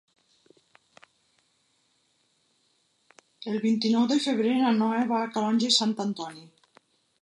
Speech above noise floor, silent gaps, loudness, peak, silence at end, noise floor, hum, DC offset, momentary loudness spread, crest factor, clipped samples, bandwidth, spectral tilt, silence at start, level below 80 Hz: 45 dB; none; -25 LUFS; -8 dBFS; 0.8 s; -70 dBFS; none; under 0.1%; 11 LU; 20 dB; under 0.1%; 11 kHz; -4 dB/octave; 3.4 s; -80 dBFS